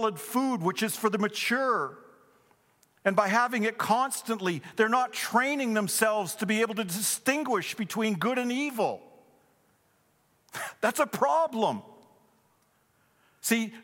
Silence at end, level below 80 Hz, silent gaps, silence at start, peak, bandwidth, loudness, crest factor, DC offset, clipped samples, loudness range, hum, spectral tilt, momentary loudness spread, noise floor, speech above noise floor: 0 s; -82 dBFS; none; 0 s; -8 dBFS; 17 kHz; -28 LUFS; 20 dB; under 0.1%; under 0.1%; 4 LU; none; -3.5 dB/octave; 6 LU; -68 dBFS; 41 dB